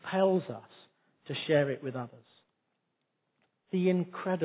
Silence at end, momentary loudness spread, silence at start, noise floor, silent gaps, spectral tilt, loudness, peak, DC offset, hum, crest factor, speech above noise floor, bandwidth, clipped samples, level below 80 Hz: 0 s; 15 LU; 0.05 s; -81 dBFS; none; -5.5 dB/octave; -31 LUFS; -14 dBFS; under 0.1%; none; 18 dB; 51 dB; 4 kHz; under 0.1%; -82 dBFS